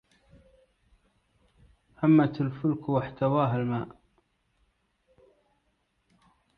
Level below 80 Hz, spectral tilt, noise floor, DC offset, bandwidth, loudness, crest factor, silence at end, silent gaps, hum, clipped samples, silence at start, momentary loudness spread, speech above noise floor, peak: -62 dBFS; -10.5 dB/octave; -74 dBFS; under 0.1%; 5 kHz; -27 LUFS; 20 dB; 2.7 s; none; none; under 0.1%; 2 s; 10 LU; 48 dB; -10 dBFS